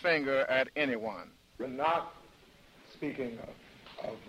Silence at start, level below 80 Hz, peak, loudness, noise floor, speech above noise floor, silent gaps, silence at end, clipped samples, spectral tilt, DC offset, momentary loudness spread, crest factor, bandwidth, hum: 0 s; -68 dBFS; -16 dBFS; -33 LUFS; -59 dBFS; 27 dB; none; 0 s; under 0.1%; -5.5 dB/octave; under 0.1%; 20 LU; 20 dB; 15.5 kHz; none